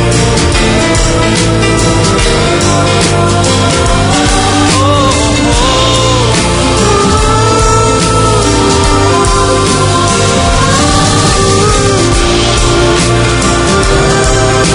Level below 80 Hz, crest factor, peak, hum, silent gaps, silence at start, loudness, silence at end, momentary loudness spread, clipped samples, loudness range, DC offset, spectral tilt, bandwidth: -18 dBFS; 8 dB; 0 dBFS; none; none; 0 s; -8 LUFS; 0 s; 1 LU; 0.4%; 1 LU; under 0.1%; -4 dB/octave; 11 kHz